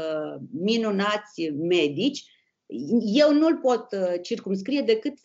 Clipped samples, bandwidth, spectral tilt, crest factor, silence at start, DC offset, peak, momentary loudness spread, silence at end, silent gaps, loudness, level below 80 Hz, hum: under 0.1%; 7.8 kHz; -5.5 dB/octave; 16 dB; 0 s; under 0.1%; -8 dBFS; 12 LU; 0.1 s; none; -24 LUFS; -76 dBFS; none